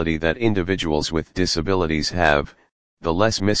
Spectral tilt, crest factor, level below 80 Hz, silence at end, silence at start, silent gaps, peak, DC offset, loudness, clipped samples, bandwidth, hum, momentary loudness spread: -5 dB/octave; 20 dB; -38 dBFS; 0 s; 0 s; 2.72-2.97 s; 0 dBFS; 2%; -21 LUFS; under 0.1%; 10 kHz; none; 6 LU